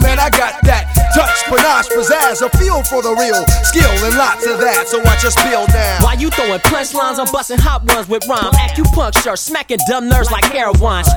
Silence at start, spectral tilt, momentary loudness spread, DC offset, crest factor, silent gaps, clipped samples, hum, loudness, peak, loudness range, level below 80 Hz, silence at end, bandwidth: 0 s; -4 dB/octave; 4 LU; under 0.1%; 12 dB; none; under 0.1%; none; -12 LUFS; 0 dBFS; 2 LU; -16 dBFS; 0 s; over 20 kHz